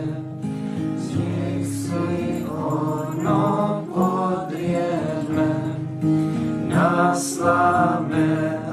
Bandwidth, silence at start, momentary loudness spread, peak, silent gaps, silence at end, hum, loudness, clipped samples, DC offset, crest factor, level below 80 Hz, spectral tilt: 13.5 kHz; 0 s; 8 LU; -4 dBFS; none; 0 s; none; -22 LUFS; under 0.1%; under 0.1%; 16 dB; -56 dBFS; -7 dB/octave